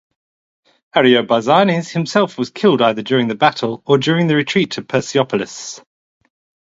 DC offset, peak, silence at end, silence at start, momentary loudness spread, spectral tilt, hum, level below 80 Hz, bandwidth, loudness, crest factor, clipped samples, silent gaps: under 0.1%; 0 dBFS; 0.85 s; 0.95 s; 9 LU; -5.5 dB/octave; none; -60 dBFS; 8 kHz; -16 LUFS; 16 dB; under 0.1%; none